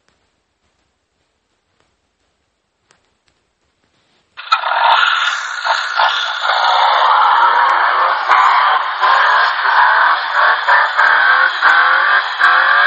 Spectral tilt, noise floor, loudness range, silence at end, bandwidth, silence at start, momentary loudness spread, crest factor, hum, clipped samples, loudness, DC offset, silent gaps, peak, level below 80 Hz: 2.5 dB/octave; -66 dBFS; 7 LU; 0 s; 8.4 kHz; 4.4 s; 6 LU; 14 dB; none; under 0.1%; -11 LUFS; under 0.1%; none; 0 dBFS; -74 dBFS